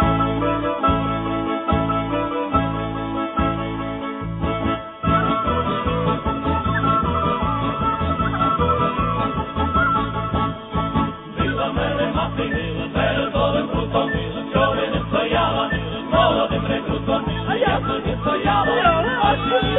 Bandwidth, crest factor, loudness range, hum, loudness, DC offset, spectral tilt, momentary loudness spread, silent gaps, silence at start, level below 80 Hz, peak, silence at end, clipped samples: 4.1 kHz; 16 dB; 3 LU; none; -21 LUFS; under 0.1%; -10 dB/octave; 6 LU; none; 0 s; -34 dBFS; -4 dBFS; 0 s; under 0.1%